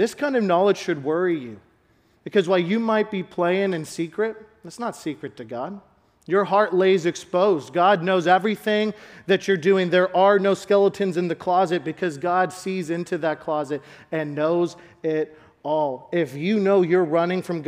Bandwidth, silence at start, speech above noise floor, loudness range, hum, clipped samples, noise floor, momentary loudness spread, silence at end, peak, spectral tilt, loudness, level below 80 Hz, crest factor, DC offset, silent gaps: 14.5 kHz; 0 s; 39 dB; 6 LU; none; under 0.1%; -61 dBFS; 13 LU; 0 s; -4 dBFS; -6 dB/octave; -22 LUFS; -68 dBFS; 18 dB; under 0.1%; none